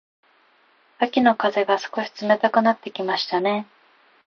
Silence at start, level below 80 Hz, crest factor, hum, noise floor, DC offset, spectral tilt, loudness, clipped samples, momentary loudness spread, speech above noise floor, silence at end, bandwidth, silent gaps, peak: 1 s; -74 dBFS; 20 dB; none; -59 dBFS; under 0.1%; -5 dB/octave; -21 LUFS; under 0.1%; 9 LU; 38 dB; 0.65 s; 6.8 kHz; none; -4 dBFS